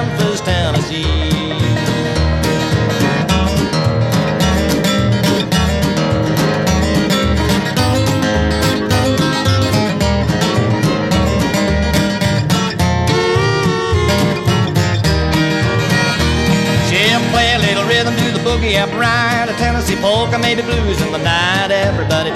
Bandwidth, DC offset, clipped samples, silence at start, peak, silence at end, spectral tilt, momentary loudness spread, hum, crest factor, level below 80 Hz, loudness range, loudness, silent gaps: 15.5 kHz; 0.1%; under 0.1%; 0 s; 0 dBFS; 0 s; -5 dB/octave; 3 LU; none; 12 dB; -26 dBFS; 2 LU; -14 LUFS; none